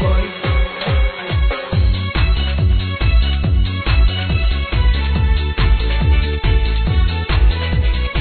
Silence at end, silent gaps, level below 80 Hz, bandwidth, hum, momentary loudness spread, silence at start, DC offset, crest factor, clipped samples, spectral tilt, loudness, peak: 0 s; none; -16 dBFS; 4.5 kHz; none; 3 LU; 0 s; 0.2%; 12 dB; under 0.1%; -9.5 dB/octave; -17 LUFS; -4 dBFS